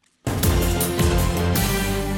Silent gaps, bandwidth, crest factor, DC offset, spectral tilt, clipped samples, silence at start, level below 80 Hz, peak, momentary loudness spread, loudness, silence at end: none; 17.5 kHz; 14 dB; under 0.1%; -5 dB/octave; under 0.1%; 0.25 s; -26 dBFS; -6 dBFS; 3 LU; -21 LUFS; 0 s